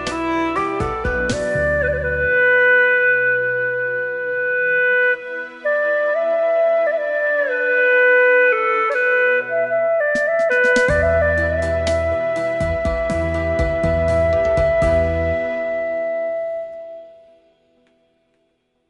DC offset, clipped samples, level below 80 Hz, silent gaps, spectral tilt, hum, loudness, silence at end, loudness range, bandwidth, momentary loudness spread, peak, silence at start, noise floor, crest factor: under 0.1%; under 0.1%; -34 dBFS; none; -5.5 dB/octave; none; -17 LUFS; 1.8 s; 5 LU; 11.5 kHz; 9 LU; -4 dBFS; 0 s; -66 dBFS; 14 dB